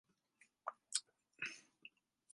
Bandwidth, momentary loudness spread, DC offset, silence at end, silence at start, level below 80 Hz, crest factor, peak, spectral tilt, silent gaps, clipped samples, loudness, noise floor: 11.5 kHz; 19 LU; under 0.1%; 0.45 s; 0.65 s; under -90 dBFS; 32 dB; -22 dBFS; 1.5 dB/octave; none; under 0.1%; -47 LUFS; -76 dBFS